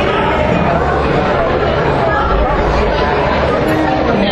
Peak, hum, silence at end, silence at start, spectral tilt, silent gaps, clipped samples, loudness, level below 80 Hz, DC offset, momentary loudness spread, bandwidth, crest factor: 0 dBFS; none; 0 s; 0 s; -7 dB/octave; none; under 0.1%; -13 LUFS; -22 dBFS; under 0.1%; 1 LU; 13 kHz; 12 dB